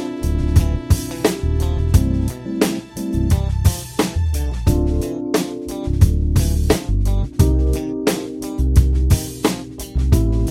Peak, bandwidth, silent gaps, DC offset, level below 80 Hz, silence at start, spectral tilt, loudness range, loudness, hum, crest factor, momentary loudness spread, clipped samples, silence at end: 0 dBFS; 16.5 kHz; none; under 0.1%; -20 dBFS; 0 s; -6.5 dB/octave; 2 LU; -19 LUFS; none; 16 dB; 6 LU; under 0.1%; 0 s